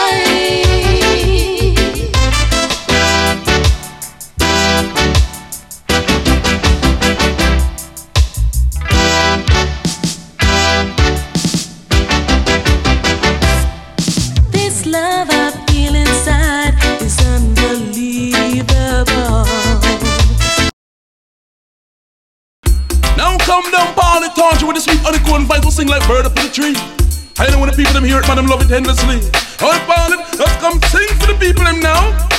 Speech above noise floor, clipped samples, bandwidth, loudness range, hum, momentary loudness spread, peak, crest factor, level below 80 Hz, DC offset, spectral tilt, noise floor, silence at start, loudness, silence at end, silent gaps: over 80 dB; under 0.1%; 16 kHz; 2 LU; none; 6 LU; 0 dBFS; 12 dB; -16 dBFS; under 0.1%; -4 dB/octave; under -90 dBFS; 0 s; -13 LUFS; 0 s; 20.73-22.63 s